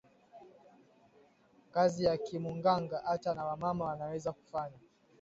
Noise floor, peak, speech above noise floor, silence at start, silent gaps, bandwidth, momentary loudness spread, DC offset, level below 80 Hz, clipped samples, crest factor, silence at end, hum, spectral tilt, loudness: -66 dBFS; -16 dBFS; 32 dB; 0.35 s; none; 7.6 kHz; 10 LU; under 0.1%; -68 dBFS; under 0.1%; 20 dB; 0.45 s; none; -5.5 dB/octave; -35 LUFS